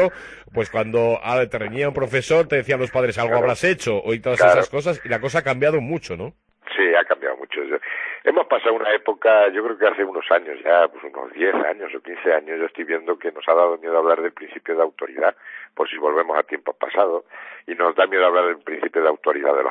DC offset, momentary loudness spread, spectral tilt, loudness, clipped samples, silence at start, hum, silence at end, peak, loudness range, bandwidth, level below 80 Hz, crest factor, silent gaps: under 0.1%; 11 LU; -5.5 dB/octave; -20 LUFS; under 0.1%; 0 s; none; 0 s; -2 dBFS; 3 LU; 10.5 kHz; -58 dBFS; 18 dB; none